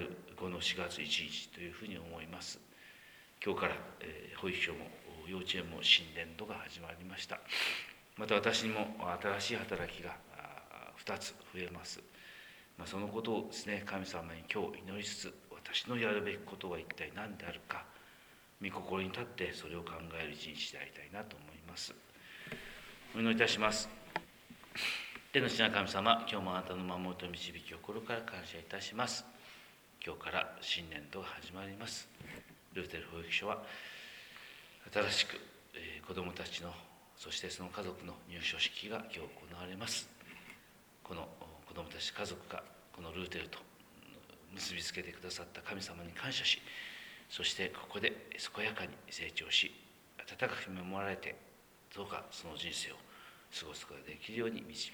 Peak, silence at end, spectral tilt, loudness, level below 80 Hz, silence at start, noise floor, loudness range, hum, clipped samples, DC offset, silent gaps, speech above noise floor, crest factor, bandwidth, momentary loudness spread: -12 dBFS; 0 s; -3 dB/octave; -39 LUFS; -68 dBFS; 0 s; -63 dBFS; 9 LU; none; under 0.1%; under 0.1%; none; 23 dB; 30 dB; over 20 kHz; 19 LU